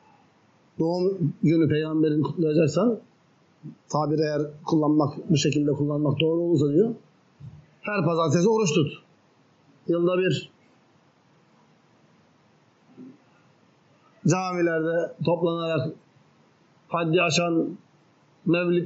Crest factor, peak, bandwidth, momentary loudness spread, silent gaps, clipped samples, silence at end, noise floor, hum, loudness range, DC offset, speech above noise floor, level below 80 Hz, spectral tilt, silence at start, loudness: 16 dB; -10 dBFS; 7.6 kHz; 10 LU; none; under 0.1%; 0 s; -61 dBFS; none; 7 LU; under 0.1%; 38 dB; -70 dBFS; -6 dB/octave; 0.8 s; -24 LUFS